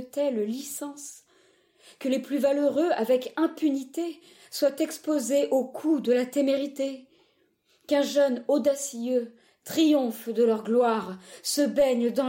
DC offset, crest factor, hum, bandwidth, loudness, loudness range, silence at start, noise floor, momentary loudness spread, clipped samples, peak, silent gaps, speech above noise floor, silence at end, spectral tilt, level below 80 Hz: under 0.1%; 14 dB; none; 16.5 kHz; -26 LUFS; 3 LU; 0 s; -67 dBFS; 12 LU; under 0.1%; -12 dBFS; none; 42 dB; 0 s; -4 dB/octave; -72 dBFS